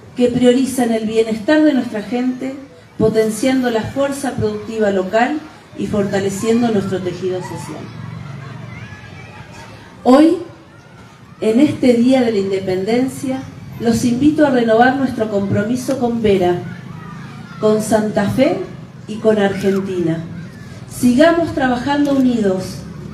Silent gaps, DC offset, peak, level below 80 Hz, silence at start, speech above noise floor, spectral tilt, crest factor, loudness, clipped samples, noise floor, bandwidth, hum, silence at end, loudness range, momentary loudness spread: none; under 0.1%; 0 dBFS; -46 dBFS; 0 s; 25 dB; -6 dB/octave; 16 dB; -16 LUFS; under 0.1%; -40 dBFS; 14.5 kHz; none; 0 s; 4 LU; 19 LU